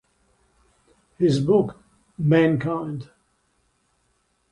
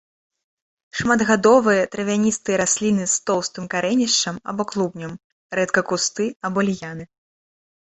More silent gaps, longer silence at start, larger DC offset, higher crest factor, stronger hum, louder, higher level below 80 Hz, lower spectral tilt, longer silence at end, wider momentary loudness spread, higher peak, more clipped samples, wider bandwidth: second, none vs 5.24-5.50 s, 6.36-6.40 s; first, 1.2 s vs 0.95 s; neither; about the same, 18 dB vs 20 dB; neither; about the same, -22 LUFS vs -20 LUFS; about the same, -58 dBFS vs -58 dBFS; first, -8 dB/octave vs -3.5 dB/octave; first, 1.5 s vs 0.8 s; about the same, 13 LU vs 12 LU; second, -6 dBFS vs -2 dBFS; neither; first, 11 kHz vs 8.4 kHz